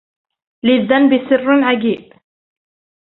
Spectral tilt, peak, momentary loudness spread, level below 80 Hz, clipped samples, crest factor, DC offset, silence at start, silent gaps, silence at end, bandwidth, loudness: -9.5 dB/octave; -2 dBFS; 8 LU; -60 dBFS; under 0.1%; 14 dB; under 0.1%; 0.65 s; none; 1.05 s; 4.1 kHz; -14 LUFS